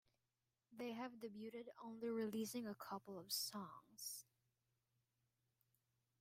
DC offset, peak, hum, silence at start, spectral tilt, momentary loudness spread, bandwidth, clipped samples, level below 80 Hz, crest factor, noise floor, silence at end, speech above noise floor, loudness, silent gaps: under 0.1%; -30 dBFS; none; 0.7 s; -3.5 dB/octave; 11 LU; 16 kHz; under 0.1%; under -90 dBFS; 22 dB; under -90 dBFS; 2 s; over 40 dB; -49 LUFS; none